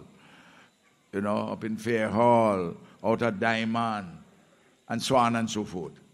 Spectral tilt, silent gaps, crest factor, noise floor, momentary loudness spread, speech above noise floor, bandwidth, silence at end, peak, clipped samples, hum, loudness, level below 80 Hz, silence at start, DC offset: -5.5 dB/octave; none; 20 dB; -63 dBFS; 14 LU; 36 dB; 15 kHz; 0.2 s; -8 dBFS; under 0.1%; none; -27 LUFS; -64 dBFS; 0 s; under 0.1%